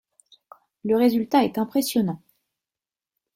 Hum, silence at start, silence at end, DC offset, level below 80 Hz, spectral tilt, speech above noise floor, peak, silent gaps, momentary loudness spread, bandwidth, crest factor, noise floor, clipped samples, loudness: none; 0.85 s; 1.2 s; under 0.1%; -66 dBFS; -5.5 dB/octave; over 69 dB; -8 dBFS; none; 11 LU; 16.5 kHz; 18 dB; under -90 dBFS; under 0.1%; -22 LUFS